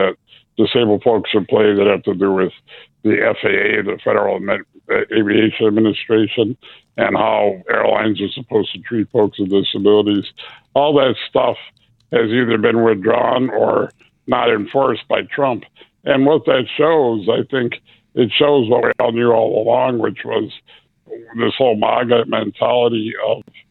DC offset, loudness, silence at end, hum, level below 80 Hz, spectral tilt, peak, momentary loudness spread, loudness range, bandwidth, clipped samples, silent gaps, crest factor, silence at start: under 0.1%; -16 LUFS; 0.3 s; none; -58 dBFS; -9 dB/octave; 0 dBFS; 8 LU; 2 LU; 4.3 kHz; under 0.1%; none; 16 dB; 0 s